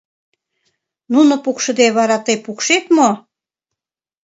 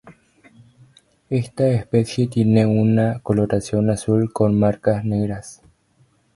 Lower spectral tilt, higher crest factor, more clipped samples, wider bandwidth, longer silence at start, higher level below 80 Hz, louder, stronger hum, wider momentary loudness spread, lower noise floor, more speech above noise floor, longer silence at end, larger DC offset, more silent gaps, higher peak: second, -3 dB/octave vs -8 dB/octave; about the same, 16 dB vs 18 dB; neither; second, 8 kHz vs 11.5 kHz; first, 1.1 s vs 0.05 s; second, -68 dBFS vs -48 dBFS; first, -14 LUFS vs -19 LUFS; neither; about the same, 6 LU vs 8 LU; first, -86 dBFS vs -59 dBFS; first, 72 dB vs 41 dB; first, 1.05 s vs 0.8 s; neither; neither; about the same, 0 dBFS vs -2 dBFS